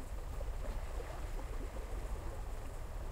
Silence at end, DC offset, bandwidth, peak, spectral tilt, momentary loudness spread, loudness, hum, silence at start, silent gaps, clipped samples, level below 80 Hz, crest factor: 0 s; under 0.1%; 16 kHz; -30 dBFS; -5.5 dB/octave; 3 LU; -46 LUFS; none; 0 s; none; under 0.1%; -42 dBFS; 12 dB